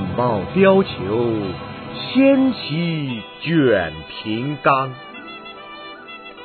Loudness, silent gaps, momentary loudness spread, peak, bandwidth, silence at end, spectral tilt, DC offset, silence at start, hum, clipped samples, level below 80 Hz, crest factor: -19 LUFS; none; 20 LU; -2 dBFS; 4.5 kHz; 0 s; -10.5 dB/octave; under 0.1%; 0 s; none; under 0.1%; -52 dBFS; 18 dB